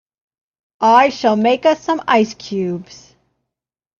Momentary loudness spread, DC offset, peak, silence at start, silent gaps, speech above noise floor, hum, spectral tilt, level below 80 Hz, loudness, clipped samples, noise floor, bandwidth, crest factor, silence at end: 11 LU; under 0.1%; 0 dBFS; 0.8 s; none; 66 dB; none; -5 dB/octave; -60 dBFS; -15 LUFS; under 0.1%; -81 dBFS; 7.2 kHz; 18 dB; 1.15 s